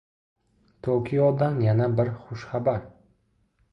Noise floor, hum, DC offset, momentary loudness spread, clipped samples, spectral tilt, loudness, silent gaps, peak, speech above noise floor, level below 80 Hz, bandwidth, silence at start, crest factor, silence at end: -68 dBFS; none; under 0.1%; 11 LU; under 0.1%; -10 dB/octave; -25 LUFS; none; -10 dBFS; 44 dB; -56 dBFS; 6.2 kHz; 0.85 s; 16 dB; 0.85 s